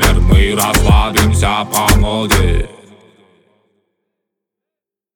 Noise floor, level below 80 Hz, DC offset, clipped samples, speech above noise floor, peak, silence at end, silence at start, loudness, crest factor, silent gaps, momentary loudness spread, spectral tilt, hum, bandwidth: -85 dBFS; -18 dBFS; under 0.1%; under 0.1%; 74 dB; 0 dBFS; 2.5 s; 0 s; -12 LUFS; 14 dB; none; 5 LU; -4.5 dB/octave; none; over 20 kHz